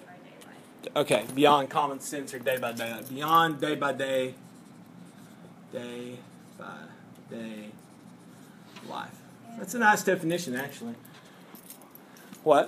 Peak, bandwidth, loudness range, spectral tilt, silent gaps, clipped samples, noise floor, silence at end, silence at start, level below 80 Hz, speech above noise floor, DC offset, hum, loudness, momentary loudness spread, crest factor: -8 dBFS; 15.5 kHz; 17 LU; -4 dB/octave; none; under 0.1%; -51 dBFS; 0 s; 0 s; -78 dBFS; 22 dB; under 0.1%; none; -28 LUFS; 27 LU; 22 dB